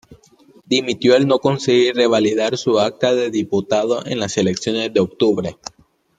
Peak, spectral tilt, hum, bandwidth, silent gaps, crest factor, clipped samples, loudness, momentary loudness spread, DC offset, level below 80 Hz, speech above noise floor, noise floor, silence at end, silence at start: -2 dBFS; -5 dB/octave; none; 9.2 kHz; none; 16 dB; under 0.1%; -17 LUFS; 7 LU; under 0.1%; -58 dBFS; 33 dB; -50 dBFS; 0.65 s; 0.1 s